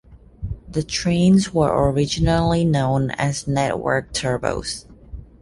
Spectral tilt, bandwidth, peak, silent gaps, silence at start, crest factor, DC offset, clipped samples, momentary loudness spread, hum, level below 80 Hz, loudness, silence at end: -5.5 dB/octave; 11.5 kHz; -4 dBFS; none; 0.1 s; 16 dB; under 0.1%; under 0.1%; 16 LU; none; -36 dBFS; -20 LUFS; 0.15 s